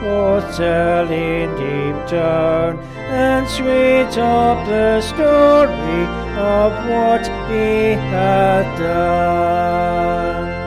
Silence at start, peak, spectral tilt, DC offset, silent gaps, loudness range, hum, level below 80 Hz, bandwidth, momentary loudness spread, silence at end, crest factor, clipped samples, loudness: 0 s; -2 dBFS; -6.5 dB/octave; under 0.1%; none; 3 LU; none; -32 dBFS; 15 kHz; 7 LU; 0 s; 14 dB; under 0.1%; -16 LUFS